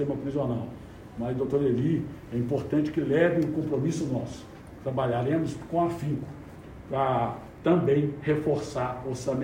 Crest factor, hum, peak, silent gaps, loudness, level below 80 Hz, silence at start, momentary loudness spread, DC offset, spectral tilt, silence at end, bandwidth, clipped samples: 16 dB; none; -12 dBFS; none; -28 LUFS; -52 dBFS; 0 s; 15 LU; under 0.1%; -7.5 dB/octave; 0 s; 16 kHz; under 0.1%